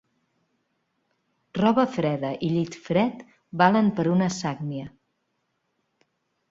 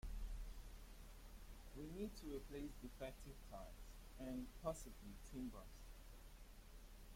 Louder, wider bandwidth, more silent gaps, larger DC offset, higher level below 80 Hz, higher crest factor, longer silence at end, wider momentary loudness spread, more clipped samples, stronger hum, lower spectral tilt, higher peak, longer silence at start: first, -24 LUFS vs -56 LUFS; second, 7.8 kHz vs 16.5 kHz; neither; neither; second, -64 dBFS vs -56 dBFS; about the same, 22 dB vs 22 dB; first, 1.6 s vs 0 s; about the same, 15 LU vs 13 LU; neither; neither; about the same, -6.5 dB/octave vs -5.5 dB/octave; first, -4 dBFS vs -32 dBFS; first, 1.55 s vs 0.05 s